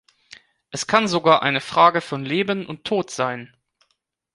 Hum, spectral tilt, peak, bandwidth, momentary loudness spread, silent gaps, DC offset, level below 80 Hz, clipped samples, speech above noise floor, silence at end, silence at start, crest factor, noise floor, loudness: none; -4 dB/octave; -2 dBFS; 11.5 kHz; 11 LU; none; under 0.1%; -64 dBFS; under 0.1%; 52 dB; 0.9 s; 0.75 s; 20 dB; -72 dBFS; -20 LUFS